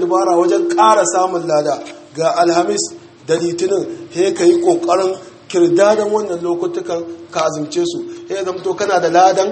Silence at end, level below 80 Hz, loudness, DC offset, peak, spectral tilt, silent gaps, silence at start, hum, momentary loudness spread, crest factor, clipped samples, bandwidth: 0 s; -64 dBFS; -15 LUFS; under 0.1%; 0 dBFS; -4 dB/octave; none; 0 s; none; 12 LU; 14 dB; under 0.1%; 8.8 kHz